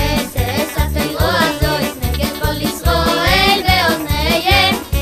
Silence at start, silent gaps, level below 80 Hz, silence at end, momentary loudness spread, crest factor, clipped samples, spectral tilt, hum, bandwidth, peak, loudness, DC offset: 0 s; none; -24 dBFS; 0 s; 7 LU; 16 dB; under 0.1%; -4 dB/octave; none; 15.5 kHz; 0 dBFS; -15 LUFS; under 0.1%